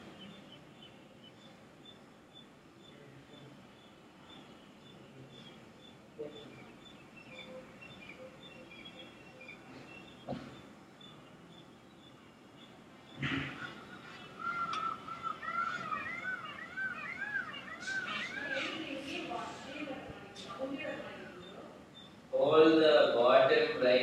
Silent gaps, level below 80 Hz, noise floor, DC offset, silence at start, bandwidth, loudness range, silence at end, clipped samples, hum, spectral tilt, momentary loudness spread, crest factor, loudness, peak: none; -72 dBFS; -57 dBFS; under 0.1%; 0 s; 11.5 kHz; 23 LU; 0 s; under 0.1%; none; -5 dB/octave; 27 LU; 24 dB; -33 LUFS; -12 dBFS